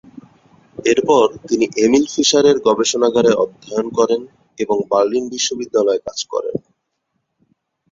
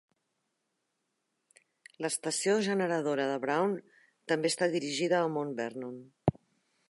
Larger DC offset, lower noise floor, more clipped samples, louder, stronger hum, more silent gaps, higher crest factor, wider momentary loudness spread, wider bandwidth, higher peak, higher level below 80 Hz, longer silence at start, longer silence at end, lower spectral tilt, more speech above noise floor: neither; second, -72 dBFS vs -82 dBFS; neither; first, -16 LUFS vs -31 LUFS; neither; neither; second, 16 dB vs 24 dB; about the same, 9 LU vs 10 LU; second, 7.8 kHz vs 11.5 kHz; first, -2 dBFS vs -8 dBFS; first, -58 dBFS vs -68 dBFS; second, 0.8 s vs 2 s; first, 1.35 s vs 0.6 s; about the same, -3.5 dB/octave vs -4.5 dB/octave; first, 56 dB vs 51 dB